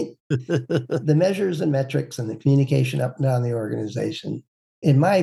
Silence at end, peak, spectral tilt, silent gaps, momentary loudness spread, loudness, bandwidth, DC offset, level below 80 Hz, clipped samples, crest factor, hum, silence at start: 0 s; -6 dBFS; -7.5 dB/octave; 0.20-0.30 s, 4.48-4.82 s; 9 LU; -22 LUFS; 12.5 kHz; under 0.1%; -66 dBFS; under 0.1%; 16 dB; none; 0 s